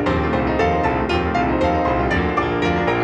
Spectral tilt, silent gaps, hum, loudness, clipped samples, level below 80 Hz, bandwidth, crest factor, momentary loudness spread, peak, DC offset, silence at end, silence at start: -7 dB/octave; none; none; -19 LUFS; under 0.1%; -30 dBFS; 9 kHz; 14 dB; 1 LU; -4 dBFS; under 0.1%; 0 s; 0 s